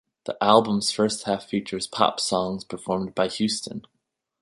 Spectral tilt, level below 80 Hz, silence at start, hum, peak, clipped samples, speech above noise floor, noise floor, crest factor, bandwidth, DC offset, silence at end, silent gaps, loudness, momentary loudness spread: -4 dB/octave; -60 dBFS; 0.25 s; none; -2 dBFS; under 0.1%; 54 dB; -78 dBFS; 24 dB; 11.5 kHz; under 0.1%; 0.6 s; none; -24 LUFS; 12 LU